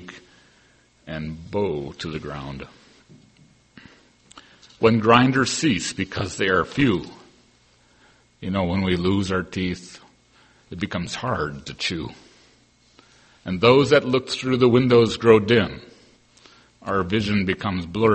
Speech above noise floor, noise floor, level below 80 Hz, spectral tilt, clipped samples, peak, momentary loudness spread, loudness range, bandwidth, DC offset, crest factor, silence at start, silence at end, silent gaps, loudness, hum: 37 dB; -58 dBFS; -50 dBFS; -5.5 dB/octave; under 0.1%; 0 dBFS; 20 LU; 13 LU; 8.8 kHz; under 0.1%; 22 dB; 0 s; 0 s; none; -21 LUFS; none